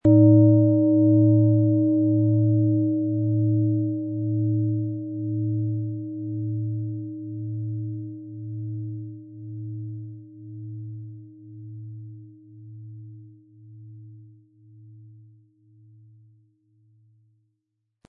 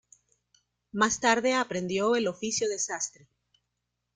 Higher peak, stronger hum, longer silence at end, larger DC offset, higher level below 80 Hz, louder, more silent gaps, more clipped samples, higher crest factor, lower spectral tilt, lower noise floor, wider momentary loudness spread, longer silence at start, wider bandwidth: about the same, -6 dBFS vs -8 dBFS; second, none vs 60 Hz at -50 dBFS; first, 3 s vs 1.05 s; neither; first, -62 dBFS vs -68 dBFS; first, -22 LUFS vs -27 LUFS; neither; neither; about the same, 18 dB vs 22 dB; first, -15 dB/octave vs -2.5 dB/octave; about the same, -79 dBFS vs -82 dBFS; first, 24 LU vs 9 LU; second, 0.05 s vs 0.95 s; second, 1.4 kHz vs 10 kHz